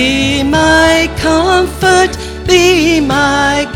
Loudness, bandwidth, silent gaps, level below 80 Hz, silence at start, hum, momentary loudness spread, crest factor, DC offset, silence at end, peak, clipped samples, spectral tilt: -10 LUFS; 16.5 kHz; none; -26 dBFS; 0 s; none; 4 LU; 10 dB; under 0.1%; 0 s; 0 dBFS; under 0.1%; -4 dB/octave